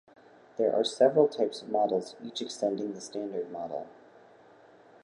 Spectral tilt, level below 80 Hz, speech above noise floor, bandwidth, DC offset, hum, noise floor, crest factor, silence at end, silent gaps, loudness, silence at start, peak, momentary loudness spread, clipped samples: -4.5 dB/octave; -82 dBFS; 28 dB; 11 kHz; under 0.1%; none; -56 dBFS; 22 dB; 1.15 s; none; -30 LUFS; 0.55 s; -8 dBFS; 14 LU; under 0.1%